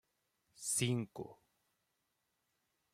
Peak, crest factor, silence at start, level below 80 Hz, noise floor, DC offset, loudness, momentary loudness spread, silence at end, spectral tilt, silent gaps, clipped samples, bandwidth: -24 dBFS; 22 dB; 0.6 s; -78 dBFS; -84 dBFS; under 0.1%; -38 LUFS; 17 LU; 1.6 s; -4 dB/octave; none; under 0.1%; 15.5 kHz